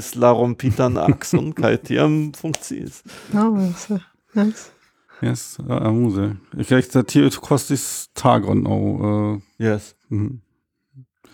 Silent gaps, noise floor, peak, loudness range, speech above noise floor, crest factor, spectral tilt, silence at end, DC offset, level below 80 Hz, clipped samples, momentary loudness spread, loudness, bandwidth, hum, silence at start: none; -70 dBFS; -2 dBFS; 4 LU; 51 dB; 18 dB; -6 dB/octave; 0.3 s; under 0.1%; -52 dBFS; under 0.1%; 11 LU; -20 LUFS; 19 kHz; none; 0 s